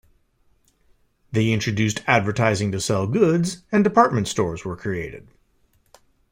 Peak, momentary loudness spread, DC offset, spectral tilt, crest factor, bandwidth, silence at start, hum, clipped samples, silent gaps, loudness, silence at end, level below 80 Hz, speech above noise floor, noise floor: -2 dBFS; 10 LU; under 0.1%; -5.5 dB/octave; 20 dB; 16 kHz; 1.3 s; none; under 0.1%; none; -21 LUFS; 1.15 s; -52 dBFS; 42 dB; -62 dBFS